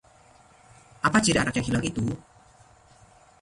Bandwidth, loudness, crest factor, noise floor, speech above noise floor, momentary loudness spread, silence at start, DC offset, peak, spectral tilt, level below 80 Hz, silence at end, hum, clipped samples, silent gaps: 11.5 kHz; -25 LUFS; 20 dB; -56 dBFS; 31 dB; 10 LU; 1.05 s; under 0.1%; -8 dBFS; -4 dB/octave; -50 dBFS; 1.25 s; none; under 0.1%; none